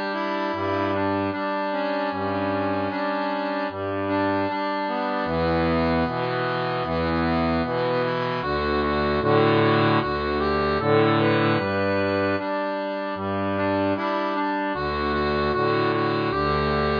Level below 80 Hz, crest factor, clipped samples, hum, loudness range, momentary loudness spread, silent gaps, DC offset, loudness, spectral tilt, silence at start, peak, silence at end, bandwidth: -42 dBFS; 16 dB; under 0.1%; none; 4 LU; 6 LU; none; under 0.1%; -23 LUFS; -8 dB/octave; 0 s; -8 dBFS; 0 s; 5.2 kHz